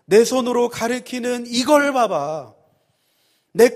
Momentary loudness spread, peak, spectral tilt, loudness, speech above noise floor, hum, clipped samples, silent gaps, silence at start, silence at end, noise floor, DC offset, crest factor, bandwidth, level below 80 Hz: 11 LU; -2 dBFS; -3.5 dB/octave; -19 LUFS; 46 dB; none; under 0.1%; none; 0.1 s; 0 s; -64 dBFS; under 0.1%; 18 dB; 15.5 kHz; -62 dBFS